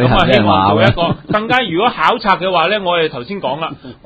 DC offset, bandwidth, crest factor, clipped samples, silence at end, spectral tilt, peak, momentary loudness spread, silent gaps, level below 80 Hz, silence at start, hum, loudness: under 0.1%; 8 kHz; 14 dB; under 0.1%; 0.1 s; -7 dB/octave; 0 dBFS; 10 LU; none; -34 dBFS; 0 s; none; -13 LUFS